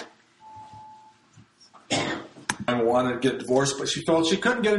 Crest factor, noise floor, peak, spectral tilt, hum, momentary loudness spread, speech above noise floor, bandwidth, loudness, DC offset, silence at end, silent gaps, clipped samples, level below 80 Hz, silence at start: 22 dB; -56 dBFS; -4 dBFS; -4 dB/octave; none; 22 LU; 33 dB; 11.5 kHz; -25 LUFS; under 0.1%; 0 s; none; under 0.1%; -62 dBFS; 0 s